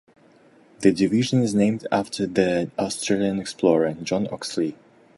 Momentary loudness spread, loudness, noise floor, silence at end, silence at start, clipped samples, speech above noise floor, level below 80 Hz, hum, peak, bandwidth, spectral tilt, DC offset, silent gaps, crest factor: 7 LU; -23 LUFS; -54 dBFS; 0.45 s; 0.8 s; under 0.1%; 32 dB; -58 dBFS; none; -4 dBFS; 11.5 kHz; -5.5 dB/octave; under 0.1%; none; 20 dB